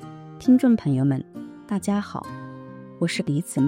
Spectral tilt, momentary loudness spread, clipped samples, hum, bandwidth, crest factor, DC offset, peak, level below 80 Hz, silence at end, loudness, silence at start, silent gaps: -6.5 dB/octave; 21 LU; under 0.1%; none; 16 kHz; 16 dB; under 0.1%; -8 dBFS; -62 dBFS; 0 s; -23 LUFS; 0 s; none